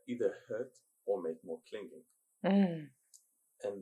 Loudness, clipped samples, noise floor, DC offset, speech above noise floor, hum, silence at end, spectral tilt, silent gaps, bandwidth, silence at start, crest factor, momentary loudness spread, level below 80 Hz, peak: -37 LUFS; under 0.1%; -67 dBFS; under 0.1%; 33 dB; none; 0 s; -8 dB/octave; none; 11.5 kHz; 0.05 s; 20 dB; 17 LU; -88 dBFS; -18 dBFS